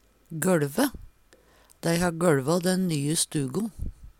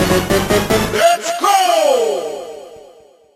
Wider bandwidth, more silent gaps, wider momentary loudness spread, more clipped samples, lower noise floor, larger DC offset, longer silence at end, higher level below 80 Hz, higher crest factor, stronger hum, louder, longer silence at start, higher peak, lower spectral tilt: first, 17 kHz vs 14.5 kHz; neither; second, 9 LU vs 15 LU; neither; first, -59 dBFS vs -45 dBFS; neither; second, 0.1 s vs 0.55 s; second, -46 dBFS vs -36 dBFS; about the same, 18 dB vs 14 dB; neither; second, -26 LUFS vs -14 LUFS; first, 0.3 s vs 0 s; second, -8 dBFS vs -2 dBFS; about the same, -5 dB/octave vs -4 dB/octave